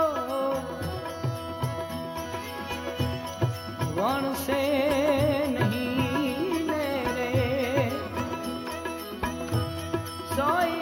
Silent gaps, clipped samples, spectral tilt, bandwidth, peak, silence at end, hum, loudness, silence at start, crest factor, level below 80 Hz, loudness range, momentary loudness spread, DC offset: none; under 0.1%; -6 dB/octave; 17 kHz; -12 dBFS; 0 s; none; -28 LUFS; 0 s; 16 dB; -52 dBFS; 6 LU; 9 LU; under 0.1%